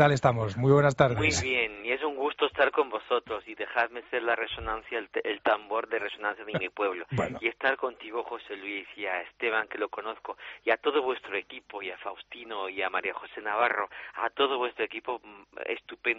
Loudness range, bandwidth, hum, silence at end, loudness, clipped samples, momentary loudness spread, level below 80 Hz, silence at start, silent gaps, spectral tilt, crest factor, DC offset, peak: 6 LU; 7.6 kHz; none; 0 s; -29 LUFS; under 0.1%; 13 LU; -58 dBFS; 0 s; none; -3.5 dB/octave; 24 dB; under 0.1%; -6 dBFS